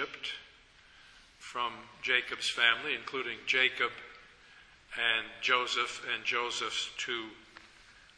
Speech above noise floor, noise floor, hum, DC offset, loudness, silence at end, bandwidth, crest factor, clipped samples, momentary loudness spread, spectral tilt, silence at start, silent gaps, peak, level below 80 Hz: 27 dB; -59 dBFS; none; under 0.1%; -31 LUFS; 0.25 s; 11 kHz; 24 dB; under 0.1%; 15 LU; -0.5 dB/octave; 0 s; none; -10 dBFS; -70 dBFS